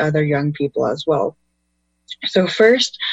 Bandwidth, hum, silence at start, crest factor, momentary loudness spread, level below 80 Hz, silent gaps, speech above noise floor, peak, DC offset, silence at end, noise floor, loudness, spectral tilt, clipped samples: 8.4 kHz; 60 Hz at -55 dBFS; 0 s; 18 dB; 11 LU; -58 dBFS; none; 51 dB; 0 dBFS; under 0.1%; 0 s; -69 dBFS; -18 LUFS; -5 dB/octave; under 0.1%